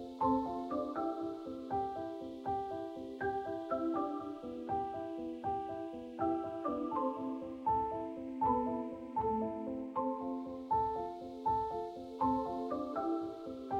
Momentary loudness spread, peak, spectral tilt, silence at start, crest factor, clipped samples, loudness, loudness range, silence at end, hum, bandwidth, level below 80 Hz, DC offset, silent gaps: 8 LU; -20 dBFS; -8 dB/octave; 0 s; 18 dB; under 0.1%; -38 LUFS; 2 LU; 0 s; none; 9 kHz; -62 dBFS; under 0.1%; none